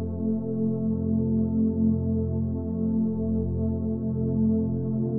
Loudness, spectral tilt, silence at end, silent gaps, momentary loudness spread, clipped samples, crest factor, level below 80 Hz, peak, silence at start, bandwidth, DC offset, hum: -26 LUFS; -17 dB/octave; 0 s; none; 4 LU; under 0.1%; 12 dB; -44 dBFS; -14 dBFS; 0 s; 1.4 kHz; under 0.1%; none